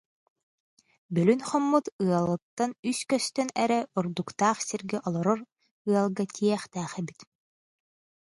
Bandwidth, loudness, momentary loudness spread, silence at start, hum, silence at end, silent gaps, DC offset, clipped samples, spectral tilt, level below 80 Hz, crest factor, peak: 11.5 kHz; -28 LUFS; 8 LU; 1.1 s; none; 1.05 s; 1.92-1.99 s, 2.42-2.57 s, 2.79-2.83 s, 5.52-5.56 s, 5.71-5.85 s; under 0.1%; under 0.1%; -5.5 dB/octave; -70 dBFS; 20 dB; -10 dBFS